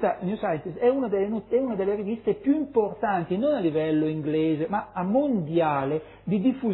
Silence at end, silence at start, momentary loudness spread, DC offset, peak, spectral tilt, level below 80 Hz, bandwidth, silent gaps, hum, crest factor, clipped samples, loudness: 0 s; 0 s; 5 LU; under 0.1%; -10 dBFS; -11.5 dB/octave; -58 dBFS; 4.1 kHz; none; none; 14 dB; under 0.1%; -26 LUFS